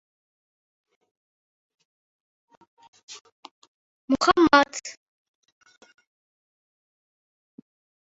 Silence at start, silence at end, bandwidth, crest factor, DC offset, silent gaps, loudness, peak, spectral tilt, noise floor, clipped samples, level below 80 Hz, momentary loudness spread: 3.1 s; 3.1 s; 8 kHz; 28 dB; under 0.1%; 3.21-3.25 s, 3.32-3.43 s, 3.51-3.62 s, 3.68-4.08 s; -20 LUFS; -2 dBFS; -1.5 dB/octave; under -90 dBFS; under 0.1%; -62 dBFS; 27 LU